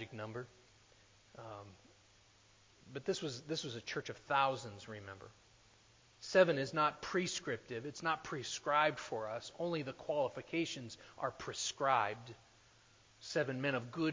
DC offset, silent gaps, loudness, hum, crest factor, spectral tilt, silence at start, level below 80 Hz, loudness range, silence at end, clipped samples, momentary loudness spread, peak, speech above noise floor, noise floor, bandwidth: under 0.1%; none; -38 LUFS; none; 24 dB; -4 dB/octave; 0 s; -74 dBFS; 9 LU; 0 s; under 0.1%; 19 LU; -16 dBFS; 29 dB; -67 dBFS; 7.6 kHz